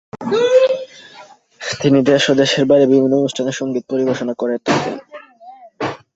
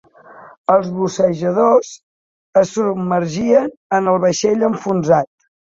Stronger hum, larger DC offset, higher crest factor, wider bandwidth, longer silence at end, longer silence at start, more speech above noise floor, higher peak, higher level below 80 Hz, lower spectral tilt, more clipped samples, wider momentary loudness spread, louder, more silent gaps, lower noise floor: neither; neither; about the same, 16 dB vs 16 dB; about the same, 8 kHz vs 7.8 kHz; second, 0.2 s vs 0.5 s; second, 0.15 s vs 0.3 s; about the same, 27 dB vs 26 dB; about the same, 0 dBFS vs -2 dBFS; about the same, -58 dBFS vs -58 dBFS; about the same, -5 dB/octave vs -6 dB/octave; neither; first, 13 LU vs 5 LU; about the same, -16 LUFS vs -16 LUFS; second, none vs 0.57-0.64 s, 2.03-2.53 s, 3.77-3.90 s; about the same, -42 dBFS vs -41 dBFS